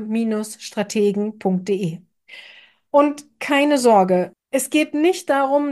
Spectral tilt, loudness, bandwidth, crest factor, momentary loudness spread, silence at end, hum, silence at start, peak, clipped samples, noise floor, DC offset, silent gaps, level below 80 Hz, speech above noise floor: -5 dB/octave; -19 LUFS; 12.5 kHz; 16 dB; 13 LU; 0 s; none; 0 s; -4 dBFS; under 0.1%; -48 dBFS; under 0.1%; none; -72 dBFS; 29 dB